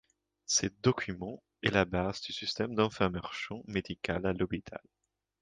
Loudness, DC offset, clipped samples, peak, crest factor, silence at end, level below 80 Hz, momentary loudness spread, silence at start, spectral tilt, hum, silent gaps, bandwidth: -33 LUFS; under 0.1%; under 0.1%; -12 dBFS; 22 dB; 0.65 s; -54 dBFS; 11 LU; 0.5 s; -4 dB/octave; none; none; 11 kHz